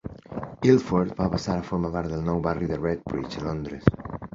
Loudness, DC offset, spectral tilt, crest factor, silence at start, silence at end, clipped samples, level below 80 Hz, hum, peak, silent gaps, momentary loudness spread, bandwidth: -26 LUFS; under 0.1%; -7.5 dB/octave; 24 dB; 0.05 s; 0.05 s; under 0.1%; -44 dBFS; none; -2 dBFS; none; 12 LU; 7.6 kHz